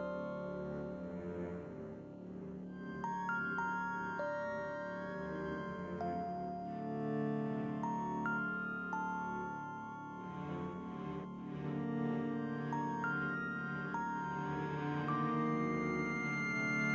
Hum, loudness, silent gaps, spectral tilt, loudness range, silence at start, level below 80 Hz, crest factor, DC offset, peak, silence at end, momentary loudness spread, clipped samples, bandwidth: none; -40 LUFS; none; -7.5 dB/octave; 5 LU; 0 s; -66 dBFS; 14 dB; under 0.1%; -24 dBFS; 0 s; 9 LU; under 0.1%; 7.8 kHz